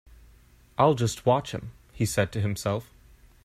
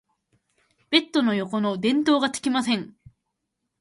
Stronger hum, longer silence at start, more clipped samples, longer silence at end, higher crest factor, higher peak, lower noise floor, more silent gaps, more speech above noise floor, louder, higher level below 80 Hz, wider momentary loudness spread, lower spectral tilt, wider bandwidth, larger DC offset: neither; about the same, 0.8 s vs 0.9 s; neither; second, 0.6 s vs 0.95 s; about the same, 22 dB vs 20 dB; about the same, -6 dBFS vs -6 dBFS; second, -56 dBFS vs -80 dBFS; neither; second, 30 dB vs 57 dB; second, -26 LUFS vs -23 LUFS; first, -52 dBFS vs -66 dBFS; first, 15 LU vs 6 LU; first, -5.5 dB/octave vs -4 dB/octave; first, 15.5 kHz vs 11.5 kHz; neither